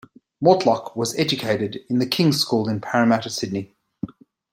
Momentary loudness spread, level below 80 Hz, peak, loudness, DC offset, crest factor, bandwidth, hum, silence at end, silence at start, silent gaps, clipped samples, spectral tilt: 17 LU; -62 dBFS; -2 dBFS; -21 LUFS; under 0.1%; 20 dB; 16.5 kHz; none; 0.45 s; 0.4 s; none; under 0.1%; -5 dB/octave